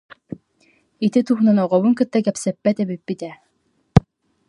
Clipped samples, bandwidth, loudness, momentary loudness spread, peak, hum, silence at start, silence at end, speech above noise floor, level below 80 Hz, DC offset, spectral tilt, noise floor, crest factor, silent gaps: under 0.1%; 11.5 kHz; -19 LUFS; 20 LU; 0 dBFS; none; 1 s; 0.5 s; 48 dB; -42 dBFS; under 0.1%; -7.5 dB/octave; -66 dBFS; 20 dB; none